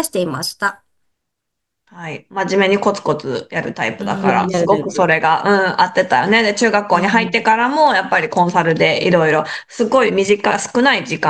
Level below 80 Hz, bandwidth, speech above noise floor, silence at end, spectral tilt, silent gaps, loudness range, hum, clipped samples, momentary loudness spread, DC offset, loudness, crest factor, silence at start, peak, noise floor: -58 dBFS; 13 kHz; 63 dB; 0 s; -4.5 dB/octave; none; 6 LU; none; under 0.1%; 9 LU; under 0.1%; -15 LUFS; 16 dB; 0 s; 0 dBFS; -78 dBFS